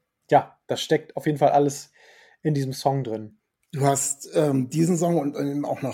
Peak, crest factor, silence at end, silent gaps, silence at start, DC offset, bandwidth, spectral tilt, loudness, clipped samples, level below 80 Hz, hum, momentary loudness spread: -4 dBFS; 20 dB; 0 s; none; 0.3 s; under 0.1%; 16.5 kHz; -5.5 dB/octave; -24 LUFS; under 0.1%; -70 dBFS; none; 10 LU